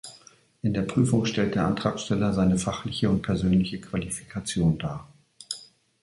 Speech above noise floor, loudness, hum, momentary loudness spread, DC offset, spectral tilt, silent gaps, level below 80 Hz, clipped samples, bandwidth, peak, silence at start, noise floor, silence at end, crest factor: 30 dB; -26 LUFS; none; 13 LU; under 0.1%; -6 dB/octave; none; -46 dBFS; under 0.1%; 11.5 kHz; -8 dBFS; 0.05 s; -55 dBFS; 0.4 s; 18 dB